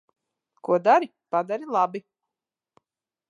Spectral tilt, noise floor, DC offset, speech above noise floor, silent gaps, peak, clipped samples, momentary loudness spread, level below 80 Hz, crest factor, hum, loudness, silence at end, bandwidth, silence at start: -6.5 dB/octave; -89 dBFS; under 0.1%; 66 dB; none; -6 dBFS; under 0.1%; 13 LU; -84 dBFS; 20 dB; none; -24 LUFS; 1.3 s; 9.8 kHz; 0.65 s